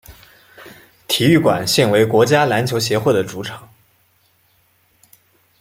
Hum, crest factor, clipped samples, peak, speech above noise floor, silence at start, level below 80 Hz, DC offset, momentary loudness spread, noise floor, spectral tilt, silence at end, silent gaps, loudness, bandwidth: none; 16 dB; under 0.1%; -2 dBFS; 43 dB; 0.1 s; -54 dBFS; under 0.1%; 14 LU; -59 dBFS; -5 dB/octave; 2 s; none; -15 LUFS; 16.5 kHz